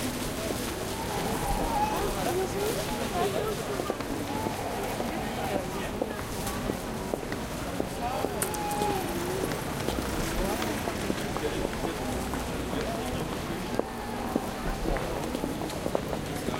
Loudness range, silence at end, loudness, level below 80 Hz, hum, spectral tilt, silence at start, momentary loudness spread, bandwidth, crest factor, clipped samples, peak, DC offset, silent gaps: 3 LU; 0 s; -31 LUFS; -42 dBFS; none; -4.5 dB/octave; 0 s; 4 LU; 17 kHz; 22 dB; under 0.1%; -8 dBFS; under 0.1%; none